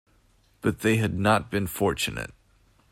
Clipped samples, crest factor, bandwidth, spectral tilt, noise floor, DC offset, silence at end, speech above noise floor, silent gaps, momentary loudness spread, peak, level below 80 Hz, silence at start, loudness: under 0.1%; 20 dB; 16 kHz; -5 dB/octave; -62 dBFS; under 0.1%; 0.6 s; 37 dB; none; 8 LU; -8 dBFS; -50 dBFS; 0.65 s; -26 LUFS